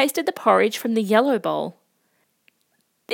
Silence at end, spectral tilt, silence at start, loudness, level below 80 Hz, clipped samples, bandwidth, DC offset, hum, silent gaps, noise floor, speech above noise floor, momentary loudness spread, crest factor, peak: 0 s; -4.5 dB/octave; 0 s; -20 LUFS; -84 dBFS; under 0.1%; 17.5 kHz; under 0.1%; none; none; -69 dBFS; 48 dB; 9 LU; 20 dB; -2 dBFS